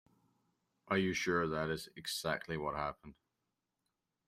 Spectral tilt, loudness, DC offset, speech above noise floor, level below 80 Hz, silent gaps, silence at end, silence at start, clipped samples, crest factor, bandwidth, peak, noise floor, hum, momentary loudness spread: -4.5 dB/octave; -37 LUFS; under 0.1%; 50 dB; -66 dBFS; none; 1.15 s; 0.85 s; under 0.1%; 22 dB; 16 kHz; -18 dBFS; -87 dBFS; none; 8 LU